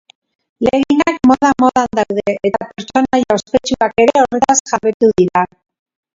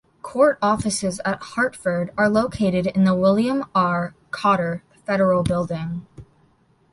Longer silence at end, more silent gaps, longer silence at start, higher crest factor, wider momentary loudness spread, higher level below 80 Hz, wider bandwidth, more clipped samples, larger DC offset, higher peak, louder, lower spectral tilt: about the same, 0.7 s vs 0.7 s; first, 4.60-4.65 s, 4.94-5.00 s vs none; first, 0.6 s vs 0.25 s; about the same, 14 dB vs 16 dB; second, 7 LU vs 10 LU; about the same, -46 dBFS vs -48 dBFS; second, 7.8 kHz vs 11.5 kHz; neither; neither; first, 0 dBFS vs -4 dBFS; first, -14 LUFS vs -21 LUFS; second, -4 dB/octave vs -6 dB/octave